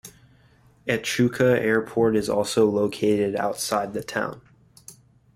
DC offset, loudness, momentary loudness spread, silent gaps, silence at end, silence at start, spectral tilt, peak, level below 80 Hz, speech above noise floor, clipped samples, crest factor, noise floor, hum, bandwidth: under 0.1%; -23 LUFS; 8 LU; none; 0.45 s; 0.05 s; -5 dB/octave; -6 dBFS; -58 dBFS; 34 dB; under 0.1%; 18 dB; -57 dBFS; none; 16 kHz